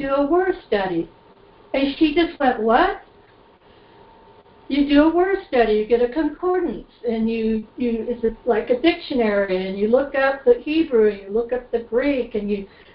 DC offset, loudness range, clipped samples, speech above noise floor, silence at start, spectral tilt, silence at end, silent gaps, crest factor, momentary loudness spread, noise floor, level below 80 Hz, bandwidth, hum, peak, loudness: under 0.1%; 3 LU; under 0.1%; 31 dB; 0 s; -10 dB/octave; 0.3 s; none; 18 dB; 8 LU; -51 dBFS; -46 dBFS; 5.4 kHz; none; -4 dBFS; -20 LUFS